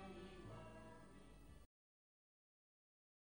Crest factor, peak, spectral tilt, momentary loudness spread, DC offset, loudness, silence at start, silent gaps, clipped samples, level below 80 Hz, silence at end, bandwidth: 16 dB; -44 dBFS; -6 dB/octave; 9 LU; under 0.1%; -60 LUFS; 0 s; none; under 0.1%; -70 dBFS; 1.65 s; over 20 kHz